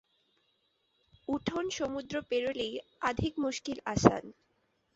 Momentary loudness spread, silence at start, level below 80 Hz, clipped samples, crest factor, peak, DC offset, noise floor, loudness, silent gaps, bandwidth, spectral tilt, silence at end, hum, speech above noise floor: 11 LU; 1.3 s; -56 dBFS; under 0.1%; 32 dB; -2 dBFS; under 0.1%; -75 dBFS; -32 LUFS; none; 8.2 kHz; -5 dB/octave; 0.65 s; none; 43 dB